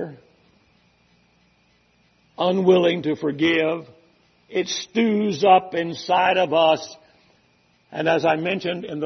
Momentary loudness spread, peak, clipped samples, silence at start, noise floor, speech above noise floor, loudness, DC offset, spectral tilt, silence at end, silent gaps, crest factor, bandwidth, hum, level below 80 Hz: 11 LU; -4 dBFS; under 0.1%; 0 s; -61 dBFS; 41 dB; -20 LUFS; under 0.1%; -5 dB/octave; 0 s; none; 20 dB; 6.4 kHz; none; -68 dBFS